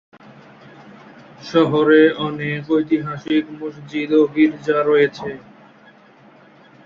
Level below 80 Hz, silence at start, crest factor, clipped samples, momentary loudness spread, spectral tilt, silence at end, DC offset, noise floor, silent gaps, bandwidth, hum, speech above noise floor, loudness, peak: -62 dBFS; 1.4 s; 18 dB; under 0.1%; 17 LU; -7 dB/octave; 1.45 s; under 0.1%; -48 dBFS; none; 7 kHz; none; 31 dB; -17 LUFS; -2 dBFS